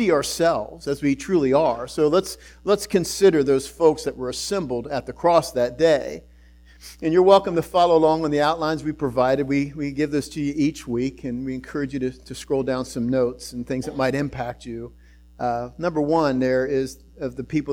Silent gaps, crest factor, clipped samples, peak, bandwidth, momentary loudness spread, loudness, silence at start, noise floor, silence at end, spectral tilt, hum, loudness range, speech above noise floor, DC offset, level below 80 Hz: none; 20 dB; under 0.1%; -2 dBFS; 18.5 kHz; 12 LU; -22 LUFS; 0 s; -49 dBFS; 0 s; -5.5 dB/octave; none; 6 LU; 28 dB; under 0.1%; -48 dBFS